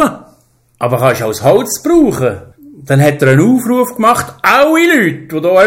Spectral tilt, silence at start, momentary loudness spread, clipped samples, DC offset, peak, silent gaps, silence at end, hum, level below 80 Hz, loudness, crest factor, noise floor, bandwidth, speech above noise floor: -5.5 dB/octave; 0 s; 8 LU; under 0.1%; under 0.1%; 0 dBFS; none; 0 s; none; -44 dBFS; -11 LUFS; 10 dB; -51 dBFS; 16.5 kHz; 41 dB